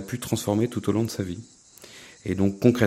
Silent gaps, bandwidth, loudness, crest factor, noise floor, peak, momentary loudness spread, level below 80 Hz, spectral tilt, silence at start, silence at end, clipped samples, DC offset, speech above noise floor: none; 16 kHz; -26 LUFS; 22 dB; -48 dBFS; -4 dBFS; 22 LU; -56 dBFS; -6 dB/octave; 0 s; 0 s; under 0.1%; under 0.1%; 24 dB